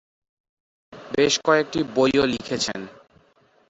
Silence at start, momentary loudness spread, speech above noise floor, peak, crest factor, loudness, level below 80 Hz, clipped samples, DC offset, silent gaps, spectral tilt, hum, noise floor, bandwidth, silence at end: 0.9 s; 10 LU; 38 dB; -4 dBFS; 20 dB; -21 LUFS; -56 dBFS; under 0.1%; under 0.1%; none; -3.5 dB/octave; none; -60 dBFS; 8.2 kHz; 0.8 s